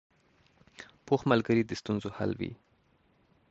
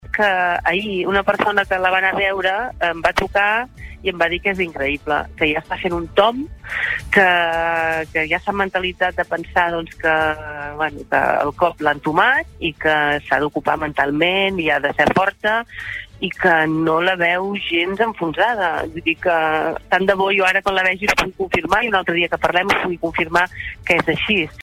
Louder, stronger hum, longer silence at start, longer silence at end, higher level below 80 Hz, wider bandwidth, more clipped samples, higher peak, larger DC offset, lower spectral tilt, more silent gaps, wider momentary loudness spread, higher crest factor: second, -30 LUFS vs -18 LUFS; neither; first, 0.8 s vs 0.05 s; first, 0.95 s vs 0 s; second, -62 dBFS vs -42 dBFS; second, 8 kHz vs 16 kHz; neither; second, -10 dBFS vs -2 dBFS; neither; first, -7 dB/octave vs -5 dB/octave; neither; first, 24 LU vs 6 LU; first, 24 dB vs 18 dB